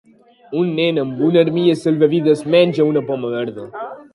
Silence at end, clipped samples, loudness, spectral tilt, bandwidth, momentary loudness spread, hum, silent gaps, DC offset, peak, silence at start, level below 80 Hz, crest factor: 0.1 s; under 0.1%; -16 LUFS; -7.5 dB/octave; 11.5 kHz; 12 LU; none; none; under 0.1%; 0 dBFS; 0.5 s; -64 dBFS; 16 dB